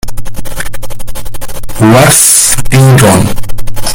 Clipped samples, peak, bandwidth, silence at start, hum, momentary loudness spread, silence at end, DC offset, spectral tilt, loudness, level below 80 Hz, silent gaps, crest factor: 4%; 0 dBFS; over 20 kHz; 0.05 s; none; 21 LU; 0 s; under 0.1%; -4 dB/octave; -5 LUFS; -22 dBFS; none; 6 dB